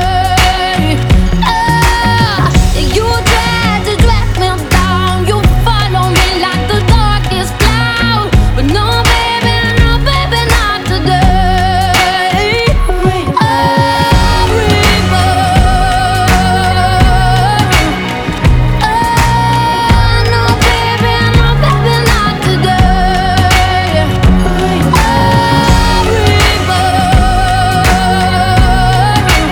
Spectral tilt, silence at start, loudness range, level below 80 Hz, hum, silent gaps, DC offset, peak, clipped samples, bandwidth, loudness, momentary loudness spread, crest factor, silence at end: -5 dB/octave; 0 s; 1 LU; -14 dBFS; none; none; under 0.1%; 0 dBFS; 0.3%; 19.5 kHz; -10 LUFS; 3 LU; 8 dB; 0 s